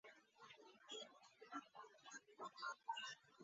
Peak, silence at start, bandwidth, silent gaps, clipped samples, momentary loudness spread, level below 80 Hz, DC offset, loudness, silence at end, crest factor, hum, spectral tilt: -36 dBFS; 0.05 s; 7.6 kHz; none; under 0.1%; 15 LU; under -90 dBFS; under 0.1%; -55 LUFS; 0 s; 20 dB; none; 1 dB/octave